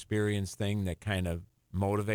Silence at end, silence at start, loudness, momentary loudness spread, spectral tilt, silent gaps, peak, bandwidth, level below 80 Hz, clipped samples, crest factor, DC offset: 0 s; 0 s; -33 LUFS; 7 LU; -6 dB/octave; none; -18 dBFS; 16 kHz; -52 dBFS; under 0.1%; 16 dB; under 0.1%